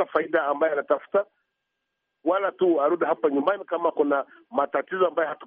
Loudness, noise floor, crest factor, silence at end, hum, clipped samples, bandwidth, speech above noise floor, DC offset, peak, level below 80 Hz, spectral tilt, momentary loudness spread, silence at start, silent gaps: -24 LUFS; -80 dBFS; 16 dB; 0 s; none; under 0.1%; 3.8 kHz; 56 dB; under 0.1%; -8 dBFS; -76 dBFS; -3.5 dB/octave; 5 LU; 0 s; none